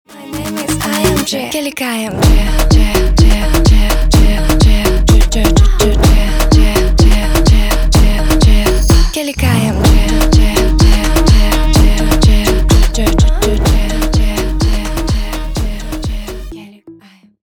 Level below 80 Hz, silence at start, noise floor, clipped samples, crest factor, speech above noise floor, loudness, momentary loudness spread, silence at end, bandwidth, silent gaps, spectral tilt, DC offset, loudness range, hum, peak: -12 dBFS; 0.1 s; -42 dBFS; under 0.1%; 10 dB; 33 dB; -12 LUFS; 9 LU; 0.5 s; 19.5 kHz; none; -5 dB/octave; under 0.1%; 4 LU; none; 0 dBFS